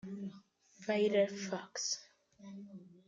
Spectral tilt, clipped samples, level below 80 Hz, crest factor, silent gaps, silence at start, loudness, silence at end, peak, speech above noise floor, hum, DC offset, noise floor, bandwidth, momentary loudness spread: -3.5 dB/octave; under 0.1%; -84 dBFS; 18 dB; none; 0.05 s; -36 LUFS; 0.15 s; -20 dBFS; 25 dB; none; under 0.1%; -61 dBFS; 9.2 kHz; 21 LU